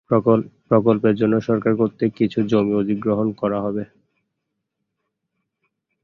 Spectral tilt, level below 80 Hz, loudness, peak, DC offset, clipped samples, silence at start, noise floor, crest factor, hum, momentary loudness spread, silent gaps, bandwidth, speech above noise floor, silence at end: -9.5 dB/octave; -56 dBFS; -20 LUFS; -2 dBFS; under 0.1%; under 0.1%; 0.1 s; -78 dBFS; 18 dB; none; 6 LU; none; 6.6 kHz; 60 dB; 2.2 s